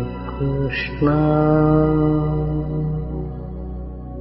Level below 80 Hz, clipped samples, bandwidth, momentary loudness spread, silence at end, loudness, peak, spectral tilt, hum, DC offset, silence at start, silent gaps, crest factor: -32 dBFS; under 0.1%; 5.8 kHz; 15 LU; 0 s; -20 LUFS; -4 dBFS; -13 dB/octave; none; under 0.1%; 0 s; none; 16 dB